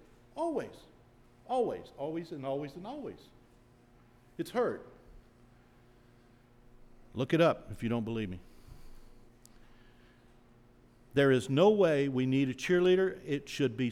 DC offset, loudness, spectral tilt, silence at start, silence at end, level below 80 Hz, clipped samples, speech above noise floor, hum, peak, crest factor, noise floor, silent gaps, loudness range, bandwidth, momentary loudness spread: under 0.1%; -31 LUFS; -6.5 dB/octave; 0.35 s; 0 s; -60 dBFS; under 0.1%; 31 dB; none; -14 dBFS; 20 dB; -61 dBFS; none; 13 LU; 14 kHz; 17 LU